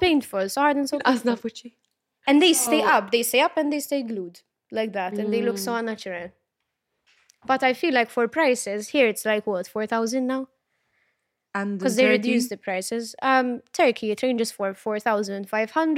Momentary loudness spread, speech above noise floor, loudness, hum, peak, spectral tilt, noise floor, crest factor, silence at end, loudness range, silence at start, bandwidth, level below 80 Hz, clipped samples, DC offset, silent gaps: 11 LU; 57 dB; -23 LUFS; none; -6 dBFS; -3 dB/octave; -80 dBFS; 18 dB; 0 s; 6 LU; 0 s; 16.5 kHz; -64 dBFS; under 0.1%; under 0.1%; none